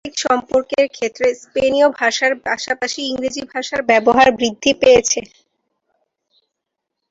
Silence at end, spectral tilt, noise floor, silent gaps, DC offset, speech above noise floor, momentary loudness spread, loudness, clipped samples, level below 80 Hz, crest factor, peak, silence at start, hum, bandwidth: 1.9 s; -2 dB/octave; -79 dBFS; none; under 0.1%; 63 dB; 10 LU; -16 LUFS; under 0.1%; -50 dBFS; 16 dB; -2 dBFS; 0.05 s; none; 8 kHz